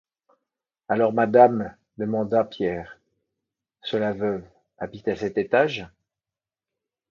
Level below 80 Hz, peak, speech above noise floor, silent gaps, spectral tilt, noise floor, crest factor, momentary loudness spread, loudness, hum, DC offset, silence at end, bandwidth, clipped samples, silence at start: -60 dBFS; -2 dBFS; over 68 dB; none; -7 dB/octave; under -90 dBFS; 22 dB; 18 LU; -23 LUFS; none; under 0.1%; 1.25 s; 7.2 kHz; under 0.1%; 0.9 s